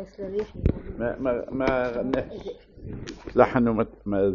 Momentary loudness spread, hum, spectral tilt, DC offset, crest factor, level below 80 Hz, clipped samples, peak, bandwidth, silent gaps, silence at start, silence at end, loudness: 17 LU; none; -6.5 dB/octave; under 0.1%; 24 dB; -40 dBFS; under 0.1%; -2 dBFS; 7.2 kHz; none; 0 s; 0 s; -26 LUFS